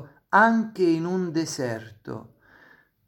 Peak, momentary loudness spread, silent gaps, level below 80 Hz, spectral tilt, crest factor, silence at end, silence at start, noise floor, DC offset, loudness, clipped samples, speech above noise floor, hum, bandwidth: -4 dBFS; 20 LU; none; -70 dBFS; -5.5 dB/octave; 22 dB; 0.85 s; 0 s; -57 dBFS; under 0.1%; -23 LUFS; under 0.1%; 33 dB; none; 17 kHz